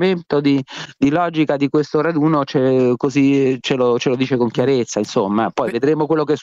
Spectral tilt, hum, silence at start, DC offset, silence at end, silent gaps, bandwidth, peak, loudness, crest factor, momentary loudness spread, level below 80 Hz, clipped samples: -6.5 dB/octave; none; 0 s; under 0.1%; 0 s; none; 7.8 kHz; -4 dBFS; -17 LUFS; 12 dB; 3 LU; -58 dBFS; under 0.1%